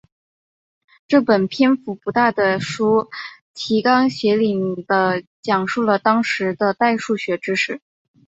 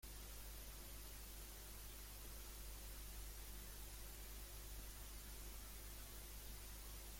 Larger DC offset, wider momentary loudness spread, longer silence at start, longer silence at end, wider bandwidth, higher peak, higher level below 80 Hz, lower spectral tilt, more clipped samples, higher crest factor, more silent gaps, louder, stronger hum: neither; first, 7 LU vs 1 LU; first, 1.1 s vs 0 s; first, 0.5 s vs 0 s; second, 8 kHz vs 16.5 kHz; first, -2 dBFS vs -42 dBFS; second, -62 dBFS vs -56 dBFS; first, -5.5 dB/octave vs -2.5 dB/octave; neither; first, 18 dB vs 12 dB; first, 3.41-3.54 s, 5.27-5.43 s vs none; first, -18 LUFS vs -55 LUFS; neither